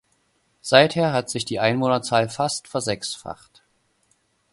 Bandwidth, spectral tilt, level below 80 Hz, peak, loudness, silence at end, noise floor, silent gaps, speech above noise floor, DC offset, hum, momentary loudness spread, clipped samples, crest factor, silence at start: 11.5 kHz; -4 dB/octave; -60 dBFS; 0 dBFS; -21 LUFS; 1.2 s; -67 dBFS; none; 45 dB; under 0.1%; none; 17 LU; under 0.1%; 22 dB; 0.65 s